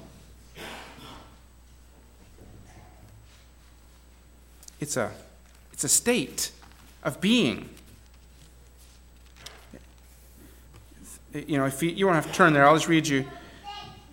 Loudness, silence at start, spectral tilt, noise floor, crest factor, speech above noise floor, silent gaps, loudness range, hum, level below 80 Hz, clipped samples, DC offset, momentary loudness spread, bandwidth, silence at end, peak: -24 LUFS; 0 s; -3.5 dB/octave; -53 dBFS; 24 dB; 29 dB; none; 22 LU; none; -54 dBFS; under 0.1%; under 0.1%; 26 LU; 17 kHz; 0.2 s; -6 dBFS